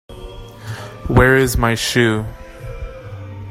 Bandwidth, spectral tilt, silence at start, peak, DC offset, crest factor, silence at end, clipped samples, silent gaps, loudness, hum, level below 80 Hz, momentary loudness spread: 16 kHz; -5 dB/octave; 0.1 s; 0 dBFS; under 0.1%; 18 dB; 0 s; under 0.1%; none; -15 LUFS; none; -30 dBFS; 22 LU